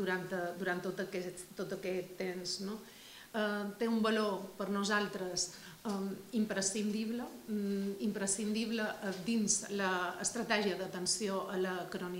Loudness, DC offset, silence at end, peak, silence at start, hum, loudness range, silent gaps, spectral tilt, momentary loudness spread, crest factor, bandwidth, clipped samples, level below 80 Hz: -36 LUFS; under 0.1%; 0 s; -16 dBFS; 0 s; none; 4 LU; none; -3.5 dB/octave; 8 LU; 22 dB; 16 kHz; under 0.1%; -72 dBFS